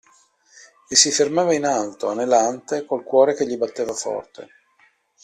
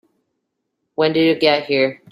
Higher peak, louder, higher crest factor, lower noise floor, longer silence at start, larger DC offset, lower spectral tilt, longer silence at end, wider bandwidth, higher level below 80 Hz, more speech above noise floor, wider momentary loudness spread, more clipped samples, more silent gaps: about the same, 0 dBFS vs -2 dBFS; second, -20 LUFS vs -17 LUFS; about the same, 20 dB vs 18 dB; second, -60 dBFS vs -75 dBFS; about the same, 0.9 s vs 1 s; neither; second, -2 dB/octave vs -6.5 dB/octave; first, 0.8 s vs 0.15 s; about the same, 13.5 kHz vs 12.5 kHz; about the same, -66 dBFS vs -66 dBFS; second, 40 dB vs 58 dB; first, 11 LU vs 5 LU; neither; neither